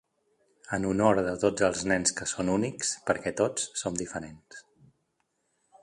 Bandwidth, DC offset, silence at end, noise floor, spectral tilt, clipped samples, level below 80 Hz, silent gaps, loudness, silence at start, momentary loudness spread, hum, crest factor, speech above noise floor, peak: 11.5 kHz; under 0.1%; 1.2 s; -76 dBFS; -4 dB/octave; under 0.1%; -58 dBFS; none; -28 LUFS; 0.65 s; 11 LU; none; 22 dB; 48 dB; -8 dBFS